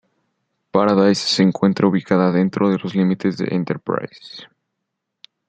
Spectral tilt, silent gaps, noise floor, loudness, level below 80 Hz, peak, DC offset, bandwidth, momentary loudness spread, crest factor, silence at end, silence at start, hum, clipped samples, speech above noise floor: -6 dB/octave; none; -78 dBFS; -18 LUFS; -62 dBFS; -2 dBFS; under 0.1%; 9 kHz; 11 LU; 18 dB; 1.05 s; 0.75 s; none; under 0.1%; 60 dB